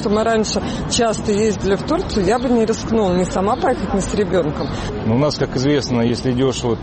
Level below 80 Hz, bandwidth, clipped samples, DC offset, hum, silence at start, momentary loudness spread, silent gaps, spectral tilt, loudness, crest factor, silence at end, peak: -34 dBFS; 8.8 kHz; under 0.1%; under 0.1%; none; 0 s; 3 LU; none; -5.5 dB/octave; -18 LUFS; 10 dB; 0 s; -6 dBFS